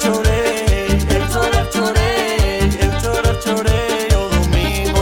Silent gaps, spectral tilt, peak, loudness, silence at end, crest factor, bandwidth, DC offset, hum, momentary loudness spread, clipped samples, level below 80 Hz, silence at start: none; -5 dB/octave; -2 dBFS; -16 LUFS; 0 s; 14 dB; 17.5 kHz; 0.2%; none; 2 LU; under 0.1%; -20 dBFS; 0 s